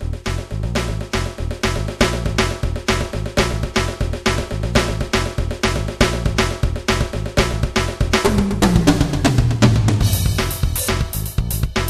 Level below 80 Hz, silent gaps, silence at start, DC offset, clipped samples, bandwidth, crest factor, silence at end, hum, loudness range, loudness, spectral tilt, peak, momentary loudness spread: -24 dBFS; none; 0 s; 0.3%; under 0.1%; 14 kHz; 18 dB; 0 s; none; 4 LU; -19 LUFS; -5 dB/octave; 0 dBFS; 8 LU